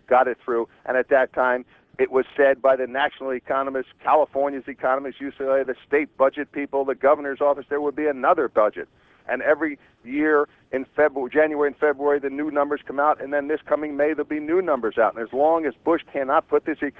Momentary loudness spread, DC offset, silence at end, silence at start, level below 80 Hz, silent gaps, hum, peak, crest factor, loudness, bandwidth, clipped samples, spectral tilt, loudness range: 8 LU; under 0.1%; 0.1 s; 0.1 s; -62 dBFS; none; none; -4 dBFS; 18 dB; -22 LUFS; 4.1 kHz; under 0.1%; -7.5 dB/octave; 1 LU